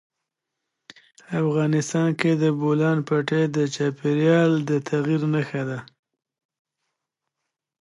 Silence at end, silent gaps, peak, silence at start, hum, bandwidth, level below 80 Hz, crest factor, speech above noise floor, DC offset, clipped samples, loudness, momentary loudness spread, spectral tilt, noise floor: 1.95 s; none; -4 dBFS; 1.3 s; none; 11 kHz; -70 dBFS; 20 dB; 62 dB; under 0.1%; under 0.1%; -22 LUFS; 7 LU; -7 dB/octave; -83 dBFS